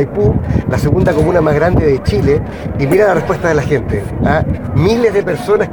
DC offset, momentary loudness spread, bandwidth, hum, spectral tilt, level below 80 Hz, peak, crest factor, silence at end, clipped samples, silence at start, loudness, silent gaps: under 0.1%; 5 LU; 19 kHz; none; -7.5 dB/octave; -26 dBFS; 0 dBFS; 12 dB; 0 s; under 0.1%; 0 s; -13 LUFS; none